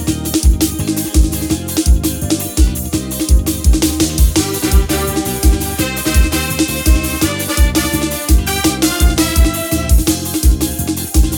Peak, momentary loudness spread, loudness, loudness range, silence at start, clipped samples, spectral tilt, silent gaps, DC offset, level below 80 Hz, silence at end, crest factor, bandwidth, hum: -2 dBFS; 4 LU; -14 LUFS; 1 LU; 0 s; under 0.1%; -4.5 dB/octave; none; under 0.1%; -16 dBFS; 0 s; 12 dB; over 20 kHz; none